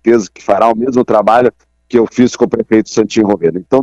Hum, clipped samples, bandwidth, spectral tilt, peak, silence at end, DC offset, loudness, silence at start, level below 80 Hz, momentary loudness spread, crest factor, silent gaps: none; under 0.1%; 8.2 kHz; -6 dB/octave; 0 dBFS; 0 s; under 0.1%; -12 LUFS; 0.05 s; -48 dBFS; 5 LU; 12 dB; none